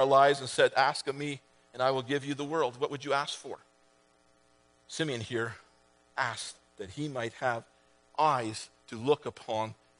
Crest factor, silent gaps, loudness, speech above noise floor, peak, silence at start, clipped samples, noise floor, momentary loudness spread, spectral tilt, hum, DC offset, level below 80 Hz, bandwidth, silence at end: 22 dB; none; -31 LUFS; 36 dB; -10 dBFS; 0 s; under 0.1%; -66 dBFS; 17 LU; -4 dB/octave; none; under 0.1%; -74 dBFS; 10.5 kHz; 0.25 s